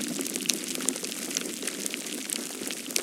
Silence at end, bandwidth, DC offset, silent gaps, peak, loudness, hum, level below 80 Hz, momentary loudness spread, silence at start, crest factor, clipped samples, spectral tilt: 0 s; 17 kHz; under 0.1%; none; 0 dBFS; -30 LUFS; none; -78 dBFS; 5 LU; 0 s; 32 dB; under 0.1%; -1 dB/octave